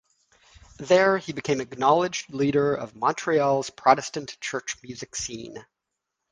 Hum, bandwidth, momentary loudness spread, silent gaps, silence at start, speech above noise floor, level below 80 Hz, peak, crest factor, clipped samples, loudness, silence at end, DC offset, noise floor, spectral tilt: none; 10 kHz; 14 LU; none; 0.8 s; 59 dB; -60 dBFS; -2 dBFS; 24 dB; under 0.1%; -24 LUFS; 0.7 s; under 0.1%; -83 dBFS; -4 dB/octave